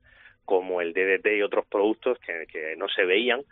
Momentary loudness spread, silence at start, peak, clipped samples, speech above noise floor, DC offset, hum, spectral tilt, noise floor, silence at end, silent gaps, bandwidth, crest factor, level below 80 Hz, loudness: 9 LU; 0.5 s; -8 dBFS; under 0.1%; 21 dB; under 0.1%; none; 0 dB/octave; -47 dBFS; 0.1 s; none; 4.1 kHz; 18 dB; -68 dBFS; -25 LUFS